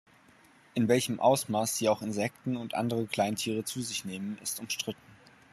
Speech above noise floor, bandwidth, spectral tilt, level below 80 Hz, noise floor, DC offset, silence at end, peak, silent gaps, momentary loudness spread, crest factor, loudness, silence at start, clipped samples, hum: 30 dB; 14 kHz; -4 dB/octave; -72 dBFS; -60 dBFS; under 0.1%; 0.35 s; -10 dBFS; none; 10 LU; 20 dB; -31 LUFS; 0.75 s; under 0.1%; none